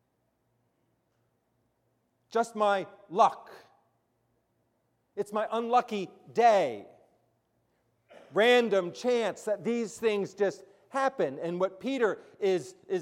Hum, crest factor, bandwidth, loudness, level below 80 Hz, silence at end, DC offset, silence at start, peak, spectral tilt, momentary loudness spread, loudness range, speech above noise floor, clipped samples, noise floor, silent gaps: none; 20 dB; 14 kHz; -29 LUFS; -82 dBFS; 0 s; under 0.1%; 2.3 s; -10 dBFS; -4.5 dB/octave; 12 LU; 4 LU; 47 dB; under 0.1%; -76 dBFS; none